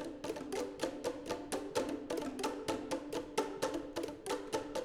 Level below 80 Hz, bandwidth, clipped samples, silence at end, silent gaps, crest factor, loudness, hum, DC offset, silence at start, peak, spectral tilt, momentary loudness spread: -64 dBFS; 19.5 kHz; under 0.1%; 0 s; none; 20 dB; -40 LUFS; none; under 0.1%; 0 s; -20 dBFS; -3.5 dB/octave; 4 LU